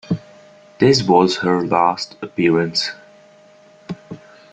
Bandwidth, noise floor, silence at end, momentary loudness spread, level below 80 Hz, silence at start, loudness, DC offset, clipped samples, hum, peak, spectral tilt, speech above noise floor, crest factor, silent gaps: 9.2 kHz; -48 dBFS; 0.35 s; 20 LU; -56 dBFS; 0.1 s; -17 LUFS; under 0.1%; under 0.1%; none; -2 dBFS; -5.5 dB/octave; 32 dB; 18 dB; none